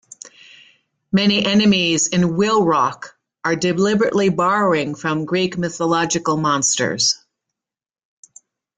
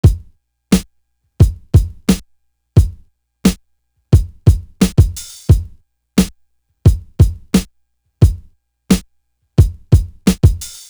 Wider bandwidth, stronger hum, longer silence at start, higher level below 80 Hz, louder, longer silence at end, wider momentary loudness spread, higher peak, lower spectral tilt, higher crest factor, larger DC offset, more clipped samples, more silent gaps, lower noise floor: second, 9.6 kHz vs over 20 kHz; neither; first, 0.25 s vs 0.05 s; second, -56 dBFS vs -20 dBFS; about the same, -17 LUFS vs -16 LUFS; first, 1.6 s vs 0.2 s; first, 9 LU vs 6 LU; second, -4 dBFS vs 0 dBFS; second, -4 dB/octave vs -6.5 dB/octave; about the same, 14 dB vs 14 dB; neither; neither; neither; first, -89 dBFS vs -63 dBFS